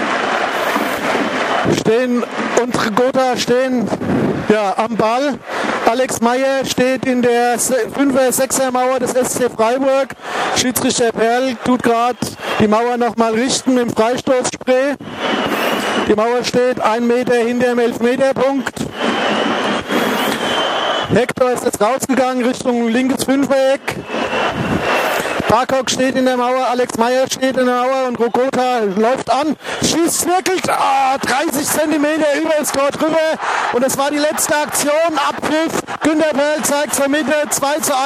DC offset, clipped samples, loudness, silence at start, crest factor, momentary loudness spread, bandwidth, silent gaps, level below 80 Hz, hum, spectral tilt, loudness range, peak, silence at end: under 0.1%; under 0.1%; -15 LUFS; 0 s; 16 dB; 3 LU; 15.5 kHz; none; -50 dBFS; none; -3.5 dB/octave; 1 LU; 0 dBFS; 0 s